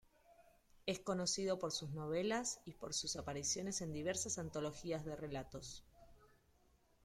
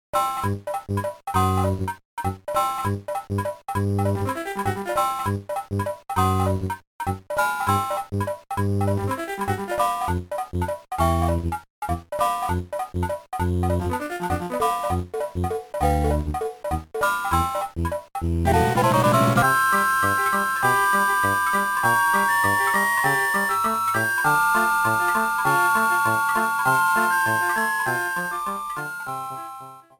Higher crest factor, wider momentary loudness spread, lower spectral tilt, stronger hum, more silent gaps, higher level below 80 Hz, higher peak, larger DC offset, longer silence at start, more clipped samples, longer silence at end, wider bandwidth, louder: about the same, 18 dB vs 16 dB; about the same, 9 LU vs 10 LU; second, -3.5 dB/octave vs -5 dB/octave; neither; second, none vs 2.05-2.17 s, 6.87-6.99 s, 11.70-11.82 s; second, -66 dBFS vs -40 dBFS; second, -26 dBFS vs -6 dBFS; neither; first, 0.3 s vs 0.15 s; neither; first, 0.8 s vs 0.2 s; second, 16 kHz vs 19.5 kHz; second, -42 LUFS vs -22 LUFS